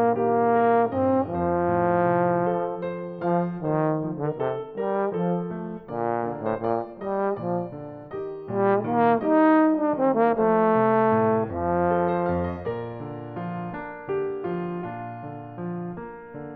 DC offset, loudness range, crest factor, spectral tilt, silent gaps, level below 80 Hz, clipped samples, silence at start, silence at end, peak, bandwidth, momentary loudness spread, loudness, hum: under 0.1%; 9 LU; 16 dB; -11.5 dB/octave; none; -56 dBFS; under 0.1%; 0 s; 0 s; -8 dBFS; 4.6 kHz; 14 LU; -24 LUFS; none